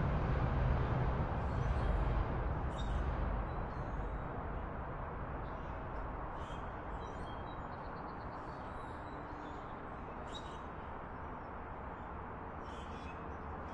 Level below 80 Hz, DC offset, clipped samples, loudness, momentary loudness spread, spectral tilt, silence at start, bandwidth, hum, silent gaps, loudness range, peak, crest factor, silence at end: -44 dBFS; under 0.1%; under 0.1%; -42 LUFS; 11 LU; -8 dB/octave; 0 s; 8.2 kHz; none; none; 9 LU; -22 dBFS; 18 dB; 0 s